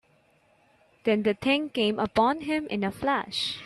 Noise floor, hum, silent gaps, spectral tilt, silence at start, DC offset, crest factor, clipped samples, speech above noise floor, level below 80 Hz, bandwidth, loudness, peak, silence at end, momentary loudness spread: -64 dBFS; none; none; -5 dB/octave; 1.05 s; under 0.1%; 18 dB; under 0.1%; 38 dB; -60 dBFS; 13 kHz; -26 LUFS; -10 dBFS; 0 s; 5 LU